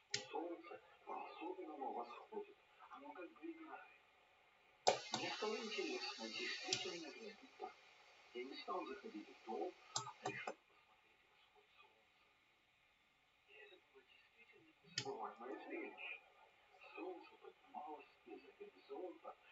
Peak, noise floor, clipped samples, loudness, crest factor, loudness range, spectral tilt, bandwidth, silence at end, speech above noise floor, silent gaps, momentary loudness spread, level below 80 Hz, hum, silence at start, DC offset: -18 dBFS; -77 dBFS; under 0.1%; -49 LUFS; 32 dB; 13 LU; -1 dB/octave; 7.6 kHz; 0 s; 28 dB; none; 23 LU; under -90 dBFS; none; 0.1 s; under 0.1%